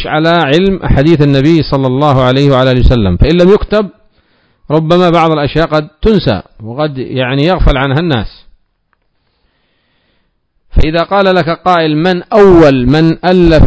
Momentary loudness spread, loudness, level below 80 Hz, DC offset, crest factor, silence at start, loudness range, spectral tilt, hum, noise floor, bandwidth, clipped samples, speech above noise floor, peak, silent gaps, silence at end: 8 LU; -9 LUFS; -20 dBFS; under 0.1%; 10 dB; 0 s; 7 LU; -8 dB/octave; none; -59 dBFS; 8 kHz; 4%; 51 dB; 0 dBFS; none; 0 s